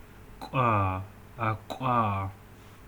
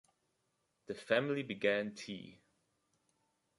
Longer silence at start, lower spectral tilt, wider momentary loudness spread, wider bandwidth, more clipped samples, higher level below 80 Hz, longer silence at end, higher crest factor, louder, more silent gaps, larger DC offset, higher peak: second, 0 s vs 0.9 s; first, -7.5 dB/octave vs -5 dB/octave; about the same, 13 LU vs 15 LU; first, 19.5 kHz vs 11.5 kHz; neither; first, -56 dBFS vs -80 dBFS; second, 0 s vs 1.25 s; about the same, 18 dB vs 22 dB; first, -29 LUFS vs -36 LUFS; neither; neither; first, -14 dBFS vs -18 dBFS